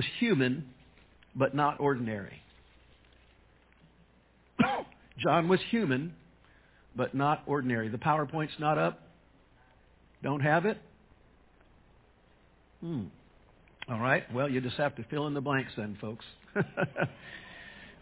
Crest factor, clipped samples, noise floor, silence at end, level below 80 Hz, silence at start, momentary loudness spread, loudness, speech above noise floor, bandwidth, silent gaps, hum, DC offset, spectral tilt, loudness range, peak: 22 dB; under 0.1%; -64 dBFS; 0.1 s; -64 dBFS; 0 s; 18 LU; -31 LUFS; 33 dB; 4 kHz; none; none; under 0.1%; -5 dB/octave; 5 LU; -10 dBFS